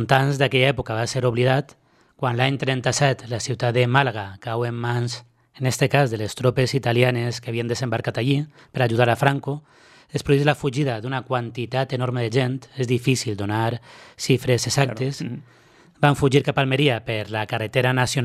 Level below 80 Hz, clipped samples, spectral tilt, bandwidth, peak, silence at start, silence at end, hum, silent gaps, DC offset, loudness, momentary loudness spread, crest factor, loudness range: -52 dBFS; under 0.1%; -5.5 dB/octave; 14 kHz; 0 dBFS; 0 s; 0 s; none; none; under 0.1%; -22 LUFS; 9 LU; 22 dB; 2 LU